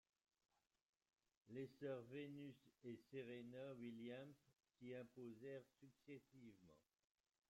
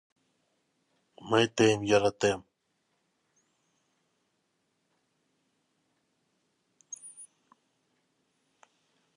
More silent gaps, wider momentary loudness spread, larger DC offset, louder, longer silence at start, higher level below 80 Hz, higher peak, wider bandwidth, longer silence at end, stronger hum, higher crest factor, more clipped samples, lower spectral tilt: neither; second, 10 LU vs 22 LU; neither; second, -58 LUFS vs -27 LUFS; first, 1.45 s vs 1.25 s; second, under -90 dBFS vs -68 dBFS; second, -40 dBFS vs -10 dBFS; first, 16 kHz vs 11.5 kHz; second, 0.7 s vs 1.9 s; neither; second, 18 dB vs 24 dB; neither; first, -7 dB/octave vs -4.5 dB/octave